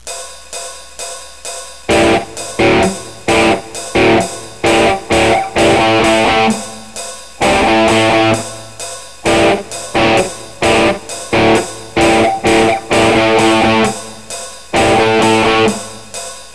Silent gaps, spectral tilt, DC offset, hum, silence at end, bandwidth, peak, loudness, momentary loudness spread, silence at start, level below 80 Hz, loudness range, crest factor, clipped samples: none; -4 dB/octave; 1%; none; 0 s; 11 kHz; 0 dBFS; -12 LUFS; 15 LU; 0.05 s; -36 dBFS; 3 LU; 14 dB; under 0.1%